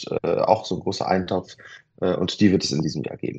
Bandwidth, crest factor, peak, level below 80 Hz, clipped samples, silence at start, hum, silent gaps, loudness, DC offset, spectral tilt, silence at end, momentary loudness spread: 8.6 kHz; 22 dB; -2 dBFS; -56 dBFS; under 0.1%; 0 s; none; none; -23 LUFS; under 0.1%; -5.5 dB/octave; 0 s; 10 LU